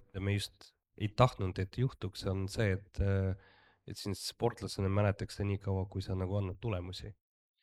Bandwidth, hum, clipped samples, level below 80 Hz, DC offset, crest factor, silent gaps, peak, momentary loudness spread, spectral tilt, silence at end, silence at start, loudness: 13.5 kHz; none; under 0.1%; -54 dBFS; under 0.1%; 24 dB; none; -12 dBFS; 11 LU; -6.5 dB/octave; 0.5 s; 0.15 s; -36 LUFS